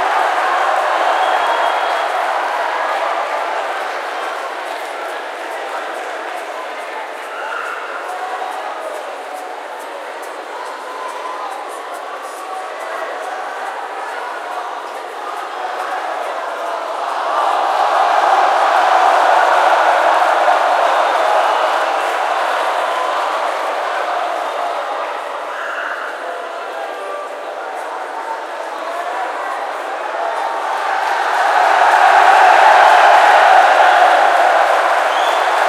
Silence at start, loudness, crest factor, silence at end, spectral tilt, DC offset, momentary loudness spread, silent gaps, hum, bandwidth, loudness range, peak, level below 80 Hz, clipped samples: 0 s; -15 LUFS; 16 dB; 0 s; 1 dB/octave; under 0.1%; 16 LU; none; none; 15.5 kHz; 15 LU; 0 dBFS; -80 dBFS; under 0.1%